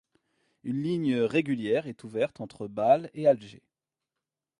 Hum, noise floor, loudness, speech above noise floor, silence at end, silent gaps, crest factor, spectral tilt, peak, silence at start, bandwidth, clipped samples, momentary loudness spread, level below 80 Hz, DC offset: none; -89 dBFS; -28 LUFS; 61 dB; 1.1 s; none; 20 dB; -7.5 dB/octave; -8 dBFS; 0.65 s; 11 kHz; under 0.1%; 12 LU; -72 dBFS; under 0.1%